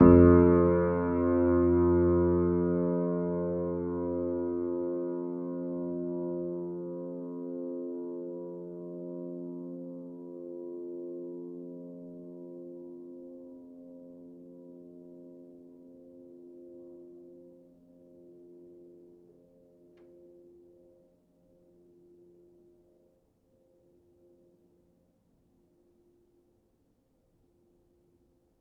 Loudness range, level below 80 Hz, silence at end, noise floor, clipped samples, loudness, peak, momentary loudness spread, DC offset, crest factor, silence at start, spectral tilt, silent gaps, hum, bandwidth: 25 LU; -50 dBFS; 9.95 s; -71 dBFS; under 0.1%; -29 LUFS; -6 dBFS; 26 LU; under 0.1%; 24 dB; 0 s; -13.5 dB/octave; none; none; 2.8 kHz